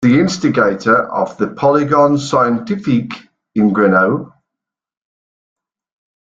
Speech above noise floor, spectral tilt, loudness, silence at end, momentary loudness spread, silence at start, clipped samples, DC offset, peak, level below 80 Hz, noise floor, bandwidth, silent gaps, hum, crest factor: 70 dB; -6.5 dB/octave; -14 LUFS; 1.95 s; 8 LU; 0 s; under 0.1%; under 0.1%; -2 dBFS; -54 dBFS; -83 dBFS; 7.8 kHz; none; none; 14 dB